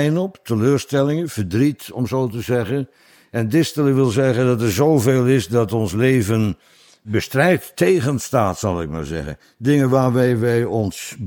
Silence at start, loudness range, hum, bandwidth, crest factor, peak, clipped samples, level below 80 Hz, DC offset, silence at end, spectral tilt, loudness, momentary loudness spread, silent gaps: 0 s; 3 LU; none; 19 kHz; 16 dB; -2 dBFS; under 0.1%; -46 dBFS; under 0.1%; 0 s; -6.5 dB/octave; -19 LUFS; 9 LU; none